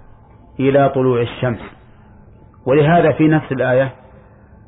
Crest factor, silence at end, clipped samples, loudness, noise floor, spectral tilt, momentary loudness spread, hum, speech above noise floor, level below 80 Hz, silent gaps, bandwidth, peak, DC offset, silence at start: 14 dB; 0.75 s; under 0.1%; -15 LUFS; -44 dBFS; -12 dB/octave; 11 LU; none; 29 dB; -46 dBFS; none; 4 kHz; -4 dBFS; under 0.1%; 0.6 s